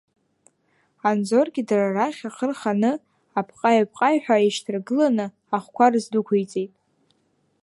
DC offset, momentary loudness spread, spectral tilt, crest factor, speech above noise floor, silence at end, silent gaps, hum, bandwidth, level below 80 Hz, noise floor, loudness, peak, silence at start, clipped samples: under 0.1%; 10 LU; -5.5 dB/octave; 20 dB; 46 dB; 0.95 s; none; none; 11.5 kHz; -76 dBFS; -67 dBFS; -22 LUFS; -4 dBFS; 1.05 s; under 0.1%